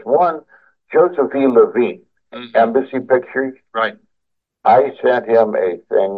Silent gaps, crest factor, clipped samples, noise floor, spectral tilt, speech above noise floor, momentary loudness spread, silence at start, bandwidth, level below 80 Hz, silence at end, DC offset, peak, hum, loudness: none; 16 dB; under 0.1%; -75 dBFS; -8 dB/octave; 60 dB; 9 LU; 0.05 s; 4.9 kHz; -68 dBFS; 0 s; under 0.1%; 0 dBFS; none; -16 LUFS